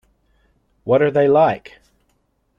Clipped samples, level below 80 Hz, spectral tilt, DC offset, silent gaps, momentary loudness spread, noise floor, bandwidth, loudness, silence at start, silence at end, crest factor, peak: under 0.1%; -58 dBFS; -8.5 dB/octave; under 0.1%; none; 16 LU; -65 dBFS; 5.8 kHz; -16 LUFS; 0.85 s; 1 s; 16 dB; -4 dBFS